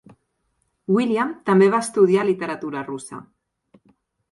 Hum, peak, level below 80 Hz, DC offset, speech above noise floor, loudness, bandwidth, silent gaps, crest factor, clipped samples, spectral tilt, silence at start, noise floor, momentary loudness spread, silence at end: none; -4 dBFS; -68 dBFS; under 0.1%; 51 dB; -20 LUFS; 11.5 kHz; none; 18 dB; under 0.1%; -6 dB/octave; 0.9 s; -71 dBFS; 18 LU; 1.1 s